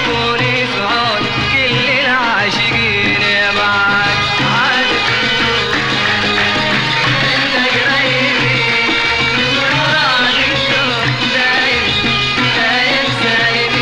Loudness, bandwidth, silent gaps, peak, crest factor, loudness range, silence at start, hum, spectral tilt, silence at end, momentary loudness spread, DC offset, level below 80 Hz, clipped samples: -12 LUFS; 13 kHz; none; -2 dBFS; 10 dB; 1 LU; 0 s; none; -3.5 dB/octave; 0 s; 2 LU; under 0.1%; -38 dBFS; under 0.1%